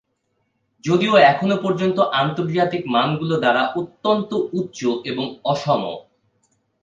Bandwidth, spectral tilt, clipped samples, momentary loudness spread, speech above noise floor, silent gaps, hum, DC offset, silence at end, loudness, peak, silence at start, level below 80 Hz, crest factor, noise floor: 7.8 kHz; -6 dB/octave; under 0.1%; 10 LU; 52 dB; none; none; under 0.1%; 0.8 s; -19 LUFS; 0 dBFS; 0.85 s; -64 dBFS; 20 dB; -70 dBFS